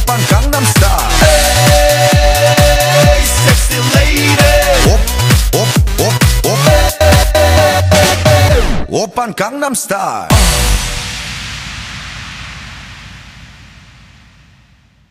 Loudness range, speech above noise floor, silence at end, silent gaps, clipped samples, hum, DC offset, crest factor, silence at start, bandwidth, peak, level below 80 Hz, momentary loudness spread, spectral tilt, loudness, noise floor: 15 LU; 36 dB; 1.65 s; none; 0.3%; none; under 0.1%; 10 dB; 0 s; 16.5 kHz; 0 dBFS; -16 dBFS; 15 LU; -4 dB/octave; -10 LUFS; -47 dBFS